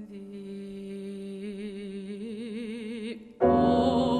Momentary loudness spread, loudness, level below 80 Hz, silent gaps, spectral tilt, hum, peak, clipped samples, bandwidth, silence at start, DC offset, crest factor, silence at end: 17 LU; -30 LUFS; -52 dBFS; none; -7.5 dB/octave; none; -10 dBFS; under 0.1%; 10 kHz; 0 s; under 0.1%; 18 dB; 0 s